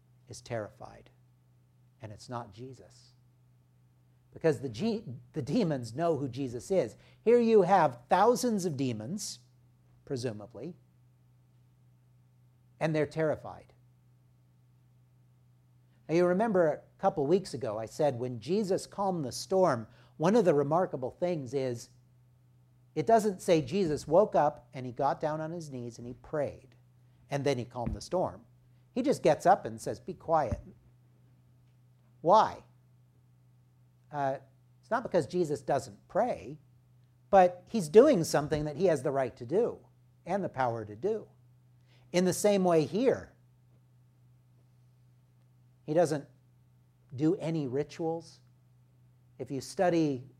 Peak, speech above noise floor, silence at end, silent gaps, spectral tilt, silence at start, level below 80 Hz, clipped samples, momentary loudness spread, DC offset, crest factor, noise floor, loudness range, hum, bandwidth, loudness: -8 dBFS; 35 dB; 0.15 s; none; -6 dB/octave; 0.3 s; -62 dBFS; under 0.1%; 17 LU; under 0.1%; 24 dB; -64 dBFS; 10 LU; none; 15 kHz; -30 LUFS